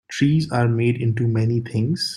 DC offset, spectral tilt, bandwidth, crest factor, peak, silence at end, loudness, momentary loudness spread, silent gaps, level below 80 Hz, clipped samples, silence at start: under 0.1%; -6.5 dB/octave; 11.5 kHz; 14 dB; -6 dBFS; 0 s; -20 LUFS; 3 LU; none; -54 dBFS; under 0.1%; 0.1 s